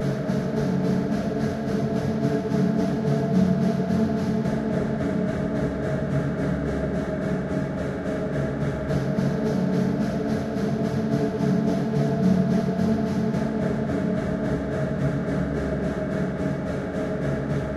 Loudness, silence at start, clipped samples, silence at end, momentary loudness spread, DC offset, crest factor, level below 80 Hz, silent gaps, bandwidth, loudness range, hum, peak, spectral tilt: -25 LUFS; 0 s; under 0.1%; 0 s; 4 LU; under 0.1%; 14 dB; -42 dBFS; none; 12 kHz; 3 LU; none; -10 dBFS; -8 dB/octave